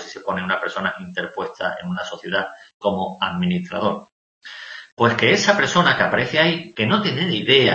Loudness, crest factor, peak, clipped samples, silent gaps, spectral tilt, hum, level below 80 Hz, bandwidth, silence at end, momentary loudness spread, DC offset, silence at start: -20 LUFS; 20 dB; 0 dBFS; under 0.1%; 2.74-2.80 s, 4.12-4.41 s, 4.92-4.97 s; -4.5 dB/octave; none; -58 dBFS; 8.2 kHz; 0 s; 13 LU; under 0.1%; 0 s